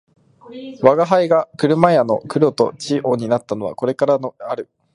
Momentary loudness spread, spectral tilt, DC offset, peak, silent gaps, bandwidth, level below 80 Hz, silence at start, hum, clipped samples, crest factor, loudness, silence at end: 13 LU; -6.5 dB/octave; under 0.1%; 0 dBFS; none; 11 kHz; -60 dBFS; 0.5 s; none; under 0.1%; 18 dB; -17 LUFS; 0.3 s